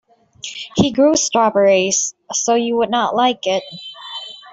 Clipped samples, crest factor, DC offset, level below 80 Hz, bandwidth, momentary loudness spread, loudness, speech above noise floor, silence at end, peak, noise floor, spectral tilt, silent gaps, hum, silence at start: under 0.1%; 14 dB; under 0.1%; -54 dBFS; 8 kHz; 16 LU; -16 LUFS; 19 dB; 0 s; -2 dBFS; -35 dBFS; -3 dB/octave; none; none; 0.45 s